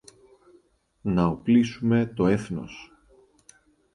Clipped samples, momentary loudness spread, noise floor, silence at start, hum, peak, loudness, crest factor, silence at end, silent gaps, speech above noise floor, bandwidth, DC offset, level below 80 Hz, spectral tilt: under 0.1%; 14 LU; -61 dBFS; 1.05 s; none; -8 dBFS; -24 LUFS; 18 dB; 1.1 s; none; 38 dB; 11 kHz; under 0.1%; -52 dBFS; -7.5 dB/octave